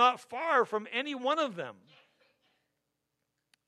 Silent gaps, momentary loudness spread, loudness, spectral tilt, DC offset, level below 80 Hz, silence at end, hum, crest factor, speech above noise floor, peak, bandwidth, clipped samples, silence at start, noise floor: none; 11 LU; -31 LUFS; -3.5 dB/octave; under 0.1%; under -90 dBFS; 1.95 s; none; 22 dB; 53 dB; -12 dBFS; 12.5 kHz; under 0.1%; 0 s; -83 dBFS